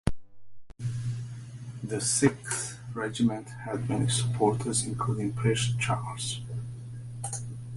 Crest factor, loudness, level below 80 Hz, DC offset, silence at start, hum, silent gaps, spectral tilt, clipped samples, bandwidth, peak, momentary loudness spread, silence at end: 22 dB; -30 LUFS; -50 dBFS; under 0.1%; 0.05 s; none; none; -4.5 dB/octave; under 0.1%; 11.5 kHz; -8 dBFS; 13 LU; 0 s